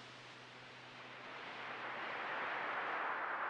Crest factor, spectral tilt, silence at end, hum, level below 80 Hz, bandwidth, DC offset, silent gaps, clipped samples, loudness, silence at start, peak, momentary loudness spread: 16 dB; -3.5 dB/octave; 0 s; none; -88 dBFS; 10.5 kHz; under 0.1%; none; under 0.1%; -43 LUFS; 0 s; -28 dBFS; 14 LU